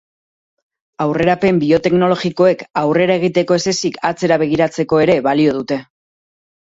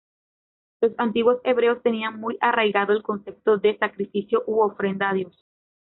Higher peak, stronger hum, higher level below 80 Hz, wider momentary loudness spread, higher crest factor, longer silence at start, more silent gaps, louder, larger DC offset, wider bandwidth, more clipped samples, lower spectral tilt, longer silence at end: first, 0 dBFS vs -6 dBFS; neither; first, -52 dBFS vs -68 dBFS; about the same, 6 LU vs 7 LU; about the same, 16 dB vs 16 dB; first, 1 s vs 0.8 s; neither; first, -15 LUFS vs -23 LUFS; neither; first, 7.8 kHz vs 4.1 kHz; neither; first, -5.5 dB/octave vs -3 dB/octave; first, 0.95 s vs 0.55 s